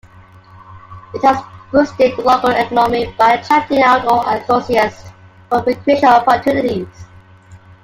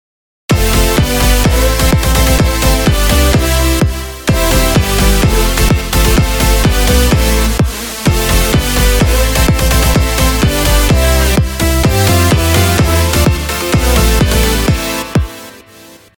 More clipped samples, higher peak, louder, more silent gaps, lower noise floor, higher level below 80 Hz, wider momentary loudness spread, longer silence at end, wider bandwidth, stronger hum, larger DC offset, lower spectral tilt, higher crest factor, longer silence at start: neither; about the same, 0 dBFS vs 0 dBFS; second, -14 LUFS vs -11 LUFS; neither; first, -42 dBFS vs -38 dBFS; second, -48 dBFS vs -14 dBFS; first, 8 LU vs 5 LU; second, 0.25 s vs 0.6 s; second, 16 kHz vs over 20 kHz; neither; neither; about the same, -5.5 dB/octave vs -4.5 dB/octave; about the same, 14 dB vs 10 dB; first, 0.7 s vs 0.5 s